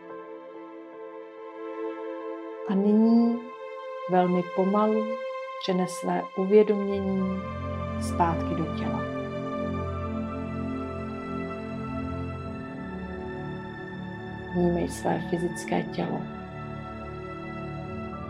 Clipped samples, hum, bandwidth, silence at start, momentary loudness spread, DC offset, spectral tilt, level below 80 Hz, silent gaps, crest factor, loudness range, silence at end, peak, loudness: under 0.1%; none; 13.5 kHz; 0 s; 15 LU; under 0.1%; -7 dB/octave; -54 dBFS; none; 20 dB; 9 LU; 0 s; -8 dBFS; -29 LUFS